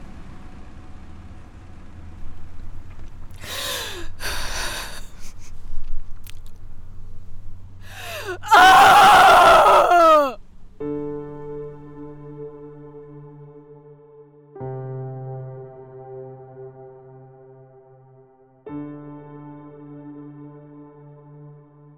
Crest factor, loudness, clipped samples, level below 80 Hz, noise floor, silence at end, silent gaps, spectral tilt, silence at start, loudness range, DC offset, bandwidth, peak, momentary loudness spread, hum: 16 dB; -14 LUFS; under 0.1%; -38 dBFS; -52 dBFS; 0.5 s; none; -3 dB/octave; 0 s; 27 LU; under 0.1%; over 20 kHz; -6 dBFS; 31 LU; none